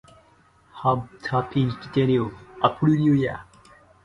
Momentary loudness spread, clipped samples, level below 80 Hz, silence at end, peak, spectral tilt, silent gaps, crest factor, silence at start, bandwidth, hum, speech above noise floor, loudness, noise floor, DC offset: 8 LU; under 0.1%; -54 dBFS; 0.6 s; -4 dBFS; -8.5 dB/octave; none; 20 dB; 0.75 s; 9.8 kHz; none; 35 dB; -23 LUFS; -57 dBFS; under 0.1%